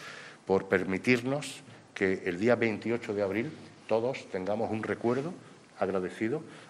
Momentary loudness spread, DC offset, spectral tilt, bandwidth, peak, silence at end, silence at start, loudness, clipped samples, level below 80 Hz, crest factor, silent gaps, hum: 14 LU; under 0.1%; -6 dB/octave; 13 kHz; -10 dBFS; 0 s; 0 s; -31 LUFS; under 0.1%; -72 dBFS; 20 dB; none; none